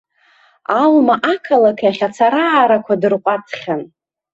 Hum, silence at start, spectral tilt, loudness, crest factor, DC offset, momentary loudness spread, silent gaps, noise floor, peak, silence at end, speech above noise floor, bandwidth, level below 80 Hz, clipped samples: none; 0.7 s; -6 dB/octave; -15 LUFS; 14 dB; under 0.1%; 11 LU; none; -53 dBFS; -2 dBFS; 0.45 s; 39 dB; 8 kHz; -64 dBFS; under 0.1%